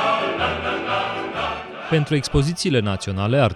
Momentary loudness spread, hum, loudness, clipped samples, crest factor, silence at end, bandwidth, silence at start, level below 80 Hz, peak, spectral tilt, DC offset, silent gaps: 5 LU; none; -22 LUFS; under 0.1%; 16 dB; 0 s; 12.5 kHz; 0 s; -40 dBFS; -6 dBFS; -5.5 dB/octave; under 0.1%; none